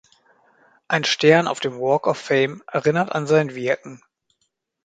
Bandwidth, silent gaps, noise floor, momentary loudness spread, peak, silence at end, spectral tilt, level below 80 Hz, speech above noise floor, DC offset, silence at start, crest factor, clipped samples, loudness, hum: 9.2 kHz; none; -73 dBFS; 9 LU; 0 dBFS; 0.9 s; -5 dB/octave; -66 dBFS; 53 dB; under 0.1%; 0.9 s; 22 dB; under 0.1%; -20 LUFS; none